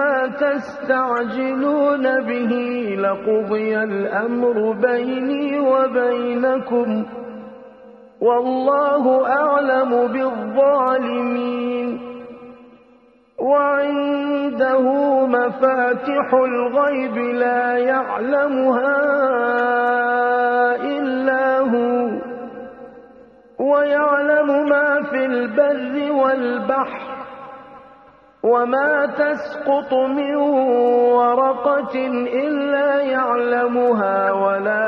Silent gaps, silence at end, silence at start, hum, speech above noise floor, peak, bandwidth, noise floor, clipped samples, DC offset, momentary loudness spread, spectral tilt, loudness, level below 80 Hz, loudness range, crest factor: none; 0 s; 0 s; none; 34 dB; -4 dBFS; 5.8 kHz; -52 dBFS; under 0.1%; under 0.1%; 7 LU; -7.5 dB/octave; -18 LUFS; -64 dBFS; 4 LU; 16 dB